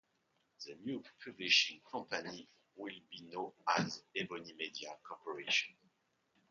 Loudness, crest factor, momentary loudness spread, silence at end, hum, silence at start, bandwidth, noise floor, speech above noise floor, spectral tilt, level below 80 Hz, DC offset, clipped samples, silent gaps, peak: -37 LUFS; 26 dB; 19 LU; 0.8 s; none; 0.6 s; 7.2 kHz; -80 dBFS; 39 dB; -0.5 dB/octave; -84 dBFS; under 0.1%; under 0.1%; none; -16 dBFS